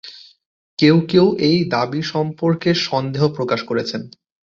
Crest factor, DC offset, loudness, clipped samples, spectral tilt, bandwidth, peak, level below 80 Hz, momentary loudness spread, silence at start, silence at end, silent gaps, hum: 16 dB; under 0.1%; -18 LUFS; under 0.1%; -6.5 dB/octave; 7.4 kHz; -2 dBFS; -56 dBFS; 10 LU; 0.05 s; 0.45 s; 0.46-0.77 s; none